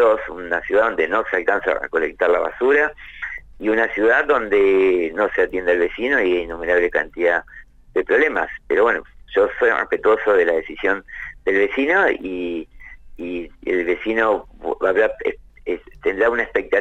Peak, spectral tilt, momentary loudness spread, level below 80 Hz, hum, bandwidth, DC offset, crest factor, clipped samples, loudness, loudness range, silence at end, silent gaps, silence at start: -6 dBFS; -5.5 dB/octave; 12 LU; -46 dBFS; none; 8 kHz; under 0.1%; 14 dB; under 0.1%; -19 LUFS; 4 LU; 0 s; none; 0 s